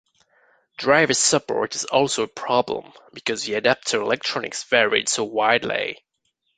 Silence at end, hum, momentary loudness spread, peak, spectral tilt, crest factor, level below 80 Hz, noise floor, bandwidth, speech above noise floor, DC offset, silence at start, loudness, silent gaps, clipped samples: 0.6 s; none; 10 LU; -2 dBFS; -2 dB/octave; 22 dB; -64 dBFS; -73 dBFS; 9.6 kHz; 51 dB; under 0.1%; 0.8 s; -21 LUFS; none; under 0.1%